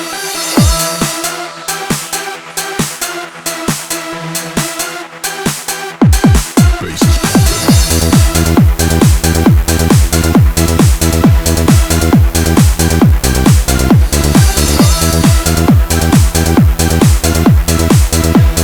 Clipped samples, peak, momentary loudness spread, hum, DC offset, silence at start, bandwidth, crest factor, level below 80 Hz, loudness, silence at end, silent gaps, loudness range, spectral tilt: 0.2%; 0 dBFS; 9 LU; none; under 0.1%; 0 s; over 20 kHz; 10 dB; -16 dBFS; -11 LUFS; 0 s; none; 8 LU; -5 dB/octave